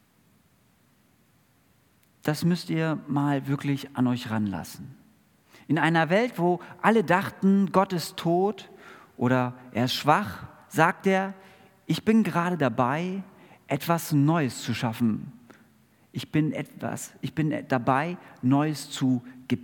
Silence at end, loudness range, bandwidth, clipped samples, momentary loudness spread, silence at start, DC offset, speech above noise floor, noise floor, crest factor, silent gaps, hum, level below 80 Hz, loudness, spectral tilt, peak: 0 s; 5 LU; 18 kHz; under 0.1%; 12 LU; 2.25 s; under 0.1%; 38 dB; -63 dBFS; 24 dB; none; none; -70 dBFS; -26 LUFS; -6 dB/octave; -4 dBFS